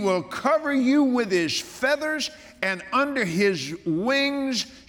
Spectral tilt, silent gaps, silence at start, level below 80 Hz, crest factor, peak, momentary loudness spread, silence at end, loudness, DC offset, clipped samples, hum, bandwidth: -4 dB/octave; none; 0 s; -62 dBFS; 18 dB; -6 dBFS; 7 LU; 0.1 s; -24 LUFS; under 0.1%; under 0.1%; none; 17.5 kHz